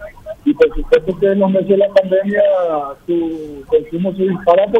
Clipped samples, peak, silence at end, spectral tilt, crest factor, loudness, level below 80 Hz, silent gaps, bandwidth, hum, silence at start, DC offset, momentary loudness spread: under 0.1%; 0 dBFS; 0 s; -8 dB/octave; 14 dB; -15 LUFS; -34 dBFS; none; 7.6 kHz; none; 0 s; under 0.1%; 8 LU